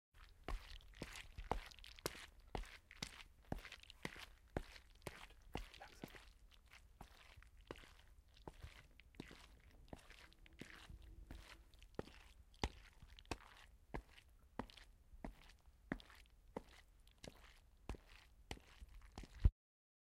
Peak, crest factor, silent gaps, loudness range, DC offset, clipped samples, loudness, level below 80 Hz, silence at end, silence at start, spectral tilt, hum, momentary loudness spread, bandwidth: -22 dBFS; 32 dB; none; 9 LU; under 0.1%; under 0.1%; -54 LUFS; -54 dBFS; 0.55 s; 0.15 s; -5 dB/octave; none; 17 LU; 16 kHz